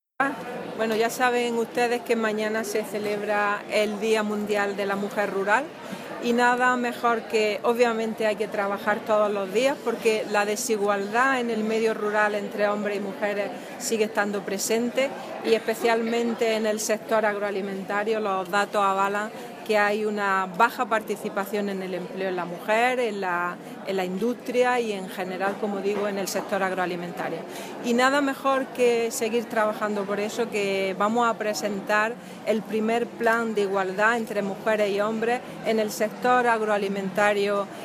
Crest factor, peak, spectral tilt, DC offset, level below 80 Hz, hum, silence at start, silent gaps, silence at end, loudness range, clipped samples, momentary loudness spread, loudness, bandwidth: 20 dB; -6 dBFS; -4 dB/octave; under 0.1%; -74 dBFS; none; 0.2 s; none; 0 s; 2 LU; under 0.1%; 7 LU; -25 LUFS; 16 kHz